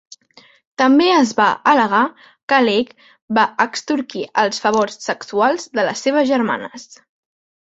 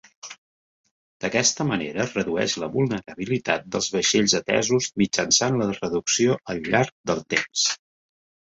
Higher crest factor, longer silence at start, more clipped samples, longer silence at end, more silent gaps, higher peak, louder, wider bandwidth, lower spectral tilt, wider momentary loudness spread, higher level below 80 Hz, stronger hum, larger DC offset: about the same, 16 dB vs 20 dB; first, 0.8 s vs 0.25 s; neither; about the same, 0.9 s vs 0.8 s; second, 2.43-2.48 s, 3.22-3.28 s vs 0.38-0.84 s, 0.91-1.20 s, 6.92-7.04 s; first, 0 dBFS vs -4 dBFS; first, -17 LUFS vs -23 LUFS; about the same, 8 kHz vs 8 kHz; about the same, -3.5 dB/octave vs -3 dB/octave; about the same, 11 LU vs 9 LU; second, -64 dBFS vs -58 dBFS; neither; neither